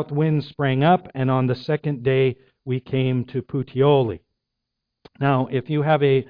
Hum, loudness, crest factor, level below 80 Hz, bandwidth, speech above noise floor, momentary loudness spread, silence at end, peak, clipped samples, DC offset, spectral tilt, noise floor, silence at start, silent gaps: none; -21 LUFS; 16 dB; -56 dBFS; 5.2 kHz; 60 dB; 9 LU; 0.05 s; -4 dBFS; under 0.1%; under 0.1%; -10 dB/octave; -81 dBFS; 0 s; none